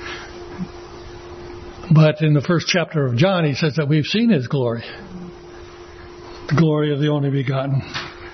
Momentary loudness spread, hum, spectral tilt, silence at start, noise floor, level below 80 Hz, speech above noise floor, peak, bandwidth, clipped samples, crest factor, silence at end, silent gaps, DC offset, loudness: 21 LU; none; -6.5 dB/octave; 0 s; -38 dBFS; -48 dBFS; 21 dB; -2 dBFS; 6.4 kHz; under 0.1%; 18 dB; 0 s; none; under 0.1%; -18 LUFS